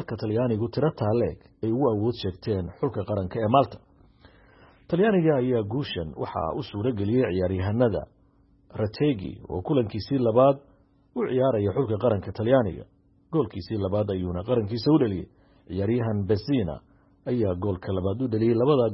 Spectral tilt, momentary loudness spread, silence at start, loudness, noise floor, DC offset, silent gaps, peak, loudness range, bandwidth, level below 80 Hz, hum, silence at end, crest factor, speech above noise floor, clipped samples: -11.5 dB/octave; 10 LU; 0 s; -26 LUFS; -60 dBFS; under 0.1%; none; -6 dBFS; 2 LU; 5.8 kHz; -52 dBFS; none; 0 s; 20 dB; 36 dB; under 0.1%